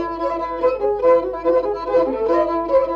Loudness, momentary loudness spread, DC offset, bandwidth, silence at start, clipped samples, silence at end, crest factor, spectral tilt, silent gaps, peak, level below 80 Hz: -19 LUFS; 5 LU; under 0.1%; 5.6 kHz; 0 s; under 0.1%; 0 s; 12 dB; -7 dB/octave; none; -6 dBFS; -44 dBFS